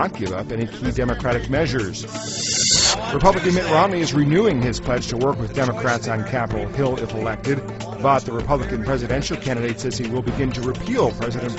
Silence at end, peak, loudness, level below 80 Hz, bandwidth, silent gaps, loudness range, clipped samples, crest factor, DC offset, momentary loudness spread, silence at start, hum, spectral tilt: 0 s; -2 dBFS; -21 LUFS; -36 dBFS; 8.2 kHz; none; 5 LU; under 0.1%; 20 dB; under 0.1%; 8 LU; 0 s; none; -4.5 dB/octave